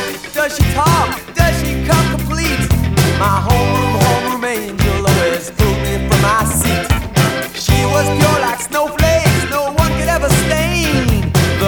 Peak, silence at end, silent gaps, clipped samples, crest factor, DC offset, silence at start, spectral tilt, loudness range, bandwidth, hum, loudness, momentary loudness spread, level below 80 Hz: 0 dBFS; 0 s; none; under 0.1%; 14 dB; under 0.1%; 0 s; -5 dB/octave; 1 LU; over 20 kHz; none; -14 LUFS; 5 LU; -24 dBFS